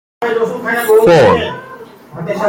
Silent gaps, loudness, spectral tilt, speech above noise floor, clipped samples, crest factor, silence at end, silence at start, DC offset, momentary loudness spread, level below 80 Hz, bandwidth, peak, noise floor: none; -12 LUFS; -5.5 dB/octave; 23 dB; under 0.1%; 12 dB; 0 s; 0.2 s; under 0.1%; 19 LU; -48 dBFS; 17 kHz; 0 dBFS; -34 dBFS